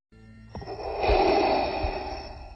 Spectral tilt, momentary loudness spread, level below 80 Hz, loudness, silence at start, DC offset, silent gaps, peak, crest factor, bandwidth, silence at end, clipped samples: -6.5 dB/octave; 18 LU; -36 dBFS; -26 LUFS; 0.2 s; under 0.1%; none; -12 dBFS; 16 dB; 8 kHz; 0 s; under 0.1%